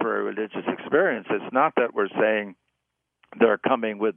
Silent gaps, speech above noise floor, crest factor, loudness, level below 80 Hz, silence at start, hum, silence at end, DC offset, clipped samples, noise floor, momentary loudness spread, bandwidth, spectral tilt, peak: none; 57 dB; 20 dB; -24 LUFS; -78 dBFS; 0 s; none; 0.05 s; under 0.1%; under 0.1%; -80 dBFS; 8 LU; 3.6 kHz; -9 dB/octave; -4 dBFS